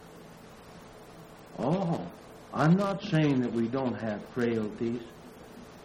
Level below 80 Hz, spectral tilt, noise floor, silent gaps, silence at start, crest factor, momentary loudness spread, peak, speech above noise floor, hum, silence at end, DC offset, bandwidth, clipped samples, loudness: -62 dBFS; -7.5 dB/octave; -50 dBFS; none; 0 s; 18 dB; 24 LU; -14 dBFS; 21 dB; none; 0 s; under 0.1%; 12.5 kHz; under 0.1%; -30 LUFS